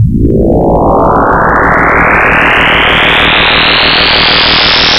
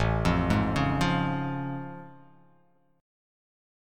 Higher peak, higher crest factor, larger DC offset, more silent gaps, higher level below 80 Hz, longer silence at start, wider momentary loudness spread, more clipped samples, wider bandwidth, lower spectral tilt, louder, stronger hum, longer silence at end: first, 0 dBFS vs -10 dBFS; second, 6 dB vs 20 dB; neither; neither; first, -20 dBFS vs -40 dBFS; about the same, 0 s vs 0 s; second, 4 LU vs 13 LU; first, 1% vs under 0.1%; first, 16 kHz vs 14 kHz; second, -5 dB/octave vs -6.5 dB/octave; first, -5 LUFS vs -27 LUFS; neither; second, 0 s vs 1 s